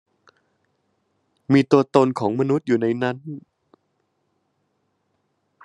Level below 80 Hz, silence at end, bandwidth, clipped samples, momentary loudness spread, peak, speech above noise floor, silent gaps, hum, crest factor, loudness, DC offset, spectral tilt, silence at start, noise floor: -68 dBFS; 2.25 s; 10.5 kHz; under 0.1%; 20 LU; 0 dBFS; 52 dB; none; none; 24 dB; -20 LUFS; under 0.1%; -7.5 dB/octave; 1.5 s; -71 dBFS